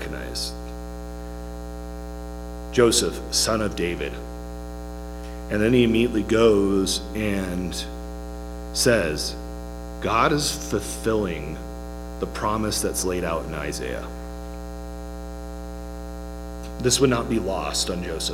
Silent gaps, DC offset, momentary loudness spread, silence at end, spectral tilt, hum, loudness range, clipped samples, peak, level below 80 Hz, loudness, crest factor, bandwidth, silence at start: none; under 0.1%; 17 LU; 0 s; -4 dB/octave; 60 Hz at -35 dBFS; 6 LU; under 0.1%; -4 dBFS; -36 dBFS; -23 LUFS; 22 dB; 17 kHz; 0 s